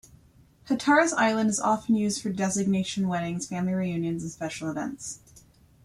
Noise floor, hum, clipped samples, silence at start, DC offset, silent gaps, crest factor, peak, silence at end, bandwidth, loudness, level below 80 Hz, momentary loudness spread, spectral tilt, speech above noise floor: -57 dBFS; none; under 0.1%; 0.65 s; under 0.1%; none; 18 dB; -8 dBFS; 0.45 s; 13 kHz; -26 LUFS; -60 dBFS; 12 LU; -4.5 dB/octave; 31 dB